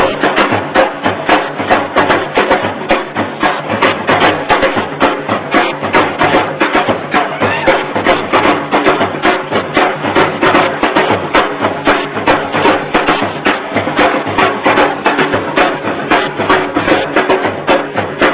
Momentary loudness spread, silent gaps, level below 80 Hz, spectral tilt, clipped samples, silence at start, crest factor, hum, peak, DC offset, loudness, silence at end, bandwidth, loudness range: 4 LU; none; -40 dBFS; -8.5 dB/octave; 0.4%; 0 s; 12 dB; none; 0 dBFS; under 0.1%; -12 LUFS; 0 s; 4 kHz; 1 LU